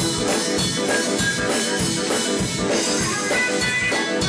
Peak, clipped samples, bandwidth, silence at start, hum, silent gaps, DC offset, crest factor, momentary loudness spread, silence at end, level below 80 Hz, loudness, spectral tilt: -10 dBFS; under 0.1%; 11 kHz; 0 s; none; none; under 0.1%; 10 dB; 2 LU; 0 s; -44 dBFS; -20 LUFS; -2.5 dB/octave